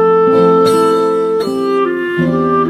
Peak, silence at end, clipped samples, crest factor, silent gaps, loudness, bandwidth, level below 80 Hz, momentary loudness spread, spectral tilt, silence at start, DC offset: 0 dBFS; 0 s; under 0.1%; 10 dB; none; -12 LUFS; 13.5 kHz; -50 dBFS; 6 LU; -6.5 dB/octave; 0 s; under 0.1%